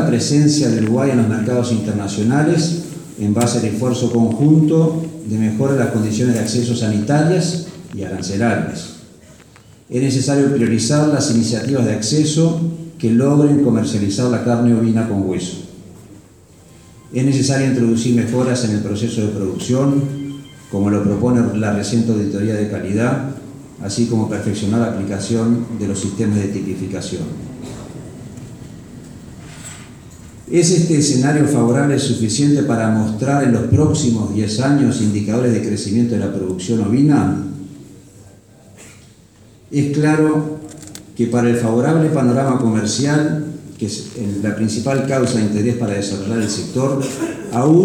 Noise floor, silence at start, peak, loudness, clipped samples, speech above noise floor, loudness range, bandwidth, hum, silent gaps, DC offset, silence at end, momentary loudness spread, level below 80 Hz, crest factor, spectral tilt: -46 dBFS; 0 s; -2 dBFS; -17 LUFS; under 0.1%; 30 dB; 5 LU; 14 kHz; none; none; under 0.1%; 0 s; 15 LU; -50 dBFS; 16 dB; -6 dB/octave